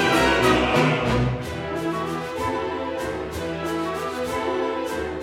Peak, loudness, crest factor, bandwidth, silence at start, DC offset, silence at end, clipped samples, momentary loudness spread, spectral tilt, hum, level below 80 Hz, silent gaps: -6 dBFS; -23 LUFS; 16 dB; 17 kHz; 0 s; under 0.1%; 0 s; under 0.1%; 10 LU; -5 dB/octave; none; -40 dBFS; none